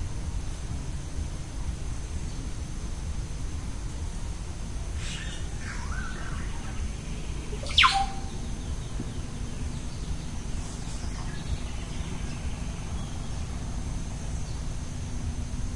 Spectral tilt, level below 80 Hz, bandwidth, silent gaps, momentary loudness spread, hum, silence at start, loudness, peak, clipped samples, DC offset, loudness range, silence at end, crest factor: -4 dB/octave; -34 dBFS; 11.5 kHz; none; 2 LU; none; 0 s; -33 LUFS; -6 dBFS; under 0.1%; 0.5%; 8 LU; 0 s; 24 dB